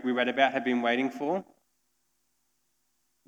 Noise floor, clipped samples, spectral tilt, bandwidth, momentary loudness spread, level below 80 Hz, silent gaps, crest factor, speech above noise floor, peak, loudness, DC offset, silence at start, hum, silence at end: -76 dBFS; under 0.1%; -5 dB/octave; 8.4 kHz; 7 LU; -88 dBFS; none; 22 dB; 49 dB; -8 dBFS; -28 LUFS; under 0.1%; 0 s; none; 1.85 s